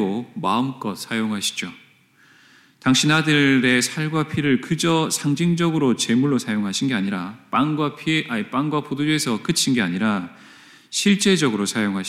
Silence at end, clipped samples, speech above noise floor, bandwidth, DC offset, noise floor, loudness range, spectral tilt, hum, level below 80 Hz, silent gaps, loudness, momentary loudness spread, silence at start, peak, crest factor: 0 s; under 0.1%; 34 dB; 15.5 kHz; under 0.1%; -55 dBFS; 3 LU; -4 dB/octave; none; -64 dBFS; none; -20 LUFS; 9 LU; 0 s; -6 dBFS; 16 dB